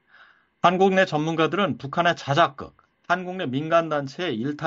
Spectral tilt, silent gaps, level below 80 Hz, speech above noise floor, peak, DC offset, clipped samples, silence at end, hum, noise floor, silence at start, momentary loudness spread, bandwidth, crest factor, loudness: -4 dB/octave; none; -64 dBFS; 33 dB; -4 dBFS; under 0.1%; under 0.1%; 0 s; none; -55 dBFS; 0.65 s; 9 LU; 7.8 kHz; 20 dB; -23 LUFS